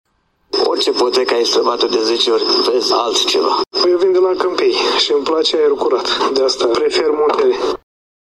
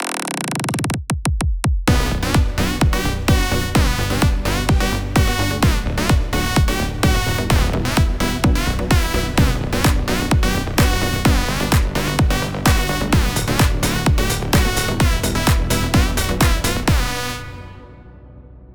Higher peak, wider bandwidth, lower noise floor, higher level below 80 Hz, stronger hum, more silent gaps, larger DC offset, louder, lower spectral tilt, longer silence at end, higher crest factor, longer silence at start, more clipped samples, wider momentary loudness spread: about the same, 0 dBFS vs 0 dBFS; second, 12.5 kHz vs over 20 kHz; about the same, -37 dBFS vs -40 dBFS; second, -56 dBFS vs -22 dBFS; neither; neither; second, 0.1% vs 1%; first, -14 LUFS vs -18 LUFS; second, -1.5 dB/octave vs -4.5 dB/octave; first, 0.6 s vs 0 s; about the same, 14 dB vs 16 dB; first, 0.55 s vs 0 s; neither; about the same, 3 LU vs 4 LU